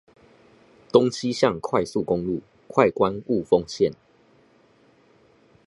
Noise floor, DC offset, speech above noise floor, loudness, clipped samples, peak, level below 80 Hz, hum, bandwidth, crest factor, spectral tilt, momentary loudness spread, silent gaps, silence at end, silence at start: -58 dBFS; under 0.1%; 36 dB; -23 LUFS; under 0.1%; -2 dBFS; -56 dBFS; none; 11.5 kHz; 24 dB; -6 dB/octave; 6 LU; none; 1.75 s; 0.95 s